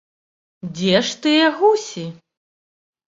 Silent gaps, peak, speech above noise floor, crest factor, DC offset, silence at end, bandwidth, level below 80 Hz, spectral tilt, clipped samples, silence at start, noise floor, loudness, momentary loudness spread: none; -2 dBFS; over 72 dB; 18 dB; under 0.1%; 0.95 s; 7.8 kHz; -62 dBFS; -4.5 dB/octave; under 0.1%; 0.65 s; under -90 dBFS; -17 LUFS; 18 LU